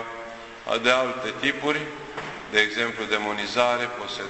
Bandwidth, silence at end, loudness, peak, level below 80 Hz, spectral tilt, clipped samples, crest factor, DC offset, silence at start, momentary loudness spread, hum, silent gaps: 8.4 kHz; 0 s; -24 LUFS; -6 dBFS; -60 dBFS; -3 dB/octave; under 0.1%; 20 dB; under 0.1%; 0 s; 14 LU; none; none